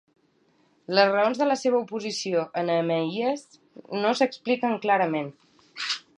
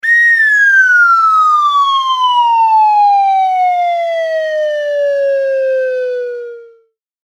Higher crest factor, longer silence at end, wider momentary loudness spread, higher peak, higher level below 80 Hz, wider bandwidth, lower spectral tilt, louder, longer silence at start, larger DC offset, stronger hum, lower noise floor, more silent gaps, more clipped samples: first, 22 dB vs 10 dB; second, 0.2 s vs 0.6 s; about the same, 10 LU vs 9 LU; about the same, -4 dBFS vs -2 dBFS; second, -80 dBFS vs -72 dBFS; second, 10.5 kHz vs 16 kHz; first, -4.5 dB/octave vs 2 dB/octave; second, -25 LUFS vs -10 LUFS; first, 0.9 s vs 0.05 s; neither; neither; first, -65 dBFS vs -52 dBFS; neither; neither